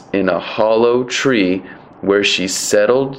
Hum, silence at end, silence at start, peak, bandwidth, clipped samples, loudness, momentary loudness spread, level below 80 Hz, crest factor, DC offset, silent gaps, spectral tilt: none; 0 s; 0 s; 0 dBFS; 16 kHz; under 0.1%; -15 LUFS; 5 LU; -52 dBFS; 16 dB; under 0.1%; none; -3.5 dB/octave